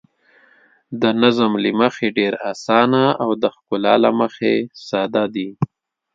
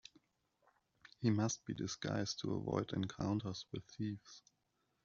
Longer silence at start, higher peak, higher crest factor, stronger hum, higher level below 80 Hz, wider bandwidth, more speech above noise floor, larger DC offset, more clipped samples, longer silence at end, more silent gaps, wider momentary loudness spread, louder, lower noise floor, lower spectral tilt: second, 0.9 s vs 1.2 s; first, 0 dBFS vs -22 dBFS; about the same, 18 dB vs 20 dB; neither; first, -62 dBFS vs -70 dBFS; about the same, 7.6 kHz vs 7.4 kHz; second, 37 dB vs 43 dB; neither; neither; second, 0.5 s vs 0.65 s; neither; second, 9 LU vs 13 LU; first, -18 LUFS vs -41 LUFS; second, -54 dBFS vs -83 dBFS; about the same, -6 dB/octave vs -6 dB/octave